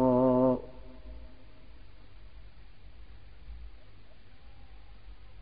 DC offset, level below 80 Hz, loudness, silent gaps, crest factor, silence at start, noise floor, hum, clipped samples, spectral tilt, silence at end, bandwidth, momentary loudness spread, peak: 0.5%; -52 dBFS; -27 LUFS; none; 20 dB; 0 s; -55 dBFS; none; under 0.1%; -9 dB/octave; 0 s; 5 kHz; 31 LU; -14 dBFS